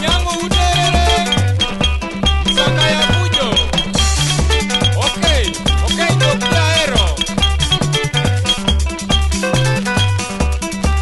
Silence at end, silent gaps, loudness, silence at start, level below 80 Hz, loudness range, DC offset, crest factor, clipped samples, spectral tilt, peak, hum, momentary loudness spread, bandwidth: 0 s; none; -14 LUFS; 0 s; -20 dBFS; 2 LU; under 0.1%; 14 dB; under 0.1%; -4 dB/octave; 0 dBFS; none; 4 LU; 12 kHz